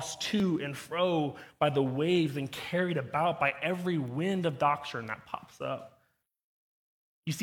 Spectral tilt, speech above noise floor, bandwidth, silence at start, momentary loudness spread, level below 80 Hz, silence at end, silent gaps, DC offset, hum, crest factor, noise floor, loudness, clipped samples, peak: -5.5 dB/octave; 43 dB; 18 kHz; 0 s; 10 LU; -70 dBFS; 0 s; 6.43-7.23 s; under 0.1%; none; 20 dB; -74 dBFS; -31 LUFS; under 0.1%; -12 dBFS